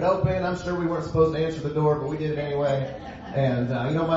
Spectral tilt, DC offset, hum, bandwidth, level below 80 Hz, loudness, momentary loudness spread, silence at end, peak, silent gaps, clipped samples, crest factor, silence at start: -8 dB/octave; under 0.1%; none; 7.8 kHz; -46 dBFS; -25 LUFS; 5 LU; 0 s; -8 dBFS; none; under 0.1%; 16 dB; 0 s